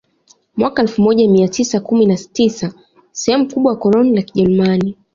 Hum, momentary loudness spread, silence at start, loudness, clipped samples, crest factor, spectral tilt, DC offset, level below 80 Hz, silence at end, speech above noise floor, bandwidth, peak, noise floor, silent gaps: none; 8 LU; 0.55 s; -14 LUFS; under 0.1%; 12 dB; -6 dB/octave; under 0.1%; -52 dBFS; 0.2 s; 40 dB; 7.6 kHz; -2 dBFS; -54 dBFS; none